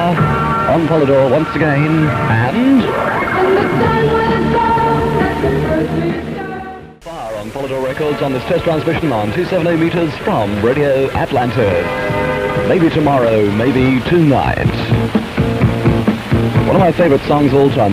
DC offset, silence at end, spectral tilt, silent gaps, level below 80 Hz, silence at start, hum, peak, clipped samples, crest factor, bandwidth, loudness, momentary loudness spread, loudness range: under 0.1%; 0 s; -7.5 dB/octave; none; -32 dBFS; 0 s; none; 0 dBFS; under 0.1%; 14 dB; 15.5 kHz; -14 LUFS; 6 LU; 5 LU